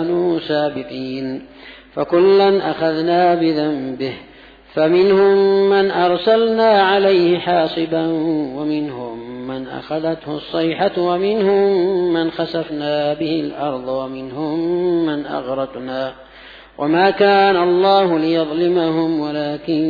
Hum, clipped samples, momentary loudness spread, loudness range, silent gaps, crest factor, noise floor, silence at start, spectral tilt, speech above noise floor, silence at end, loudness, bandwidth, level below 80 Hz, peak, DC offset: none; under 0.1%; 13 LU; 7 LU; none; 14 dB; -39 dBFS; 0 s; -8 dB/octave; 23 dB; 0 s; -17 LUFS; 5 kHz; -54 dBFS; -2 dBFS; under 0.1%